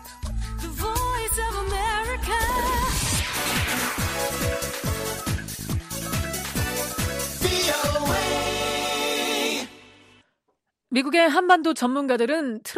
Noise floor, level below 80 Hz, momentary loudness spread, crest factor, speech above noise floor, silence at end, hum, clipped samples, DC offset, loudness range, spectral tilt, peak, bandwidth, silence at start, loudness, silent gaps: -75 dBFS; -36 dBFS; 10 LU; 20 dB; 54 dB; 0 s; none; under 0.1%; under 0.1%; 4 LU; -3.5 dB/octave; -4 dBFS; 15.5 kHz; 0 s; -24 LUFS; none